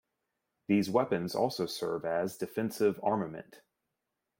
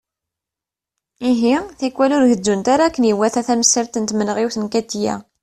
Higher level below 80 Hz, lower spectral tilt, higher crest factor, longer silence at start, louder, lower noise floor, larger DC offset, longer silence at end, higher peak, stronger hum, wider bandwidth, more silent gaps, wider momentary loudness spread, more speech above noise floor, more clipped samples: second, -72 dBFS vs -54 dBFS; first, -6 dB/octave vs -3.5 dB/octave; about the same, 20 dB vs 18 dB; second, 0.7 s vs 1.2 s; second, -32 LUFS vs -17 LUFS; about the same, -86 dBFS vs -87 dBFS; neither; first, 0.85 s vs 0.2 s; second, -14 dBFS vs 0 dBFS; neither; first, 16.5 kHz vs 13 kHz; neither; about the same, 7 LU vs 8 LU; second, 54 dB vs 70 dB; neither